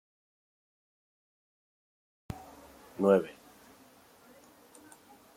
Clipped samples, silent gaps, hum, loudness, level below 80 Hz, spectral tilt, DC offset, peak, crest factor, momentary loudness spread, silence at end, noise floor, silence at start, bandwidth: under 0.1%; none; none; -28 LUFS; -66 dBFS; -7 dB/octave; under 0.1%; -12 dBFS; 26 dB; 28 LU; 2.05 s; -59 dBFS; 2.3 s; 16.5 kHz